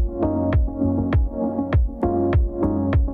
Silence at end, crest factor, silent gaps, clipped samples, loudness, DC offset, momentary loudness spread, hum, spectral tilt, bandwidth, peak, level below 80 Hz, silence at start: 0 s; 12 dB; none; under 0.1%; -22 LUFS; under 0.1%; 2 LU; none; -11.5 dB/octave; 4.6 kHz; -8 dBFS; -24 dBFS; 0 s